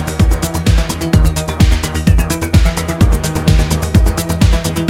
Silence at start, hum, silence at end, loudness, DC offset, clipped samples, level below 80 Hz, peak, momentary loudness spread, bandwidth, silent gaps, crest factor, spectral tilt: 0 s; none; 0 s; -13 LUFS; under 0.1%; under 0.1%; -14 dBFS; 0 dBFS; 2 LU; 16.5 kHz; none; 12 dB; -5.5 dB/octave